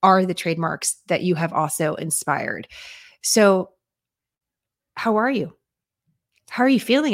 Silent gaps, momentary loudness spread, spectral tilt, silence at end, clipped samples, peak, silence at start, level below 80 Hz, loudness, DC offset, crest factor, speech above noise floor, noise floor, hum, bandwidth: none; 17 LU; -4 dB/octave; 0 s; under 0.1%; -2 dBFS; 0 s; -68 dBFS; -21 LUFS; under 0.1%; 20 dB; 67 dB; -87 dBFS; none; 16.5 kHz